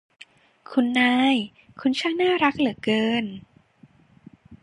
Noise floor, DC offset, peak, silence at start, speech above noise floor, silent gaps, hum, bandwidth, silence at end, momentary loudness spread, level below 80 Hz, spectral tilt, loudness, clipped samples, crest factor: -55 dBFS; under 0.1%; -6 dBFS; 0.7 s; 33 dB; none; none; 11 kHz; 0.1 s; 10 LU; -64 dBFS; -5 dB/octave; -22 LUFS; under 0.1%; 18 dB